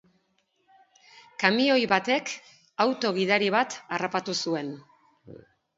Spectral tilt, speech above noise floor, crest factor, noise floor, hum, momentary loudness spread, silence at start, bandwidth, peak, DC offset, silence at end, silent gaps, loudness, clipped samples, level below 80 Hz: -4 dB/octave; 46 dB; 24 dB; -72 dBFS; none; 16 LU; 1.4 s; 7.8 kHz; -4 dBFS; under 0.1%; 0.4 s; none; -25 LUFS; under 0.1%; -74 dBFS